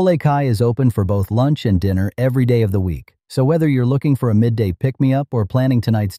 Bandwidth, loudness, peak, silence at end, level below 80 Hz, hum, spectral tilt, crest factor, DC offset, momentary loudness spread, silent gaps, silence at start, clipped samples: 15 kHz; -17 LUFS; -4 dBFS; 0 s; -40 dBFS; none; -8.5 dB/octave; 12 dB; under 0.1%; 4 LU; none; 0 s; under 0.1%